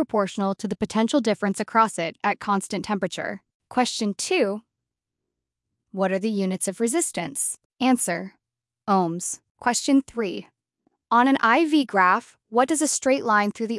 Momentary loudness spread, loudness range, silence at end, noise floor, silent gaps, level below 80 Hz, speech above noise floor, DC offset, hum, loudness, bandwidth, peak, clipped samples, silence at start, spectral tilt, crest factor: 10 LU; 6 LU; 0 s; -85 dBFS; 3.55-3.60 s, 7.65-7.70 s, 9.50-9.55 s; -66 dBFS; 62 dB; under 0.1%; none; -23 LUFS; 12 kHz; -6 dBFS; under 0.1%; 0 s; -4 dB/octave; 18 dB